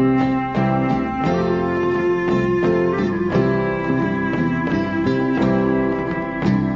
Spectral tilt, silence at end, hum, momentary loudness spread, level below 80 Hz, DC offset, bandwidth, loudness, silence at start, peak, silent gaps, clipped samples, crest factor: -8.5 dB/octave; 0 s; none; 3 LU; -42 dBFS; 0.2%; 7.4 kHz; -19 LUFS; 0 s; -6 dBFS; none; under 0.1%; 12 dB